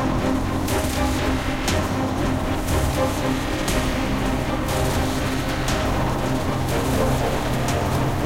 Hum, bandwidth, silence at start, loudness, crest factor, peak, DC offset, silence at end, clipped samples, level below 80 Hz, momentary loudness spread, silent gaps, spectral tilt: none; 17 kHz; 0 s; -23 LUFS; 14 dB; -8 dBFS; 1%; 0 s; under 0.1%; -30 dBFS; 2 LU; none; -5 dB/octave